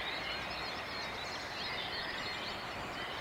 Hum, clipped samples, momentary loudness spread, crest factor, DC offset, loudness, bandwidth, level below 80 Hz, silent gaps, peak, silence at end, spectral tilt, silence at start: none; under 0.1%; 3 LU; 14 dB; under 0.1%; -39 LUFS; 16 kHz; -60 dBFS; none; -26 dBFS; 0 s; -3 dB/octave; 0 s